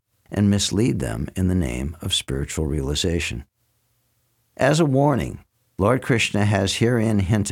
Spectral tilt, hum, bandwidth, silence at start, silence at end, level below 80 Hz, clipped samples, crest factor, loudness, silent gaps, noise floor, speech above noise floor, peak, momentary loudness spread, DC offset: -5 dB/octave; none; 16 kHz; 0.3 s; 0 s; -38 dBFS; under 0.1%; 16 dB; -21 LUFS; none; -68 dBFS; 47 dB; -6 dBFS; 10 LU; under 0.1%